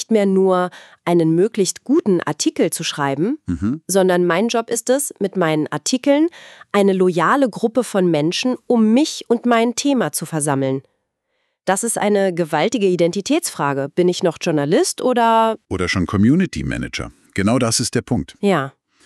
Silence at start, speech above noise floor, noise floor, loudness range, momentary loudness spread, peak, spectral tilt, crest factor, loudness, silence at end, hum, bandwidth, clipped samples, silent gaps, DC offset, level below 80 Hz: 0 s; 53 dB; -71 dBFS; 2 LU; 7 LU; -2 dBFS; -5 dB/octave; 14 dB; -18 LUFS; 0.35 s; none; 13.5 kHz; under 0.1%; none; under 0.1%; -48 dBFS